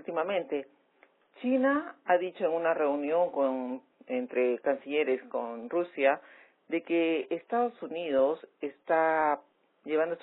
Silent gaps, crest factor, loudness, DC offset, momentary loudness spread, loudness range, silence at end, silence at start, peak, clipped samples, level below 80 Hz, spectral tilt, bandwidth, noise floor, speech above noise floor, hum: none; 18 dB; -30 LUFS; under 0.1%; 9 LU; 2 LU; 0.05 s; 0.1 s; -12 dBFS; under 0.1%; -80 dBFS; -3 dB/octave; 4 kHz; -65 dBFS; 36 dB; none